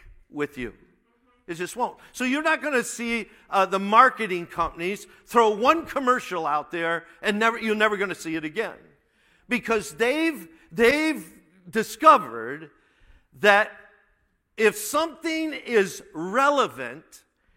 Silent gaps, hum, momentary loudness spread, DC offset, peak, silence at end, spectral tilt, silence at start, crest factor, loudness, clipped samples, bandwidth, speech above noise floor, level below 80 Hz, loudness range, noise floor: none; none; 15 LU; under 0.1%; -2 dBFS; 0.4 s; -3.5 dB/octave; 0.1 s; 24 dB; -23 LUFS; under 0.1%; 16.5 kHz; 44 dB; -58 dBFS; 4 LU; -68 dBFS